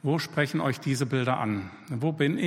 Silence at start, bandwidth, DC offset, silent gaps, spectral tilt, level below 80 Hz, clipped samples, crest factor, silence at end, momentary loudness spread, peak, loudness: 0.05 s; 16 kHz; under 0.1%; none; -6 dB/octave; -68 dBFS; under 0.1%; 16 dB; 0 s; 5 LU; -10 dBFS; -28 LUFS